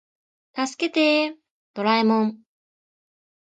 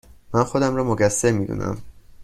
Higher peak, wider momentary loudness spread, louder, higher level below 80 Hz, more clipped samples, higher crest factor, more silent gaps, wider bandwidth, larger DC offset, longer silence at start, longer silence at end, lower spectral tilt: second, -8 dBFS vs -4 dBFS; about the same, 11 LU vs 10 LU; about the same, -22 LUFS vs -21 LUFS; second, -78 dBFS vs -46 dBFS; neither; about the same, 16 dB vs 18 dB; first, 1.50-1.74 s vs none; second, 9 kHz vs 14.5 kHz; neither; first, 0.55 s vs 0.3 s; first, 1.1 s vs 0 s; about the same, -4.5 dB/octave vs -5.5 dB/octave